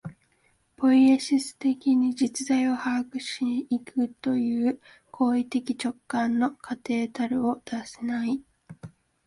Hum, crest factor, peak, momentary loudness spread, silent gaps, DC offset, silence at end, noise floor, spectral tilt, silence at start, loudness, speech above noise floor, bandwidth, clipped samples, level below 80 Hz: none; 14 dB; -12 dBFS; 11 LU; none; under 0.1%; 0.4 s; -67 dBFS; -4.5 dB/octave; 0.05 s; -26 LUFS; 42 dB; 11.5 kHz; under 0.1%; -68 dBFS